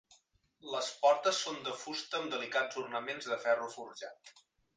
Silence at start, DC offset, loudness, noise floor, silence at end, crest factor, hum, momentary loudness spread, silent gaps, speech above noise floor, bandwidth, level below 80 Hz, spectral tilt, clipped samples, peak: 0.1 s; under 0.1%; -34 LUFS; -70 dBFS; 0.45 s; 20 dB; none; 16 LU; none; 35 dB; 10 kHz; -86 dBFS; -1.5 dB/octave; under 0.1%; -16 dBFS